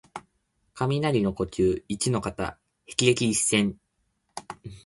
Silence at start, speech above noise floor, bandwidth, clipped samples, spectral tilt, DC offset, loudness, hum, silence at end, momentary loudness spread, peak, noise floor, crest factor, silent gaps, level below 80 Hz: 0.15 s; 49 dB; 11.5 kHz; under 0.1%; -4.5 dB/octave; under 0.1%; -25 LUFS; none; 0.05 s; 20 LU; -6 dBFS; -74 dBFS; 22 dB; none; -50 dBFS